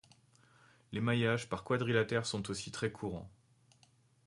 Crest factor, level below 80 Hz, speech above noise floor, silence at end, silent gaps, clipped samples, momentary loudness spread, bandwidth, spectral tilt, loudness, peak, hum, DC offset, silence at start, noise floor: 22 dB; -64 dBFS; 34 dB; 0.95 s; none; under 0.1%; 12 LU; 11.5 kHz; -5.5 dB/octave; -35 LUFS; -16 dBFS; none; under 0.1%; 0.9 s; -69 dBFS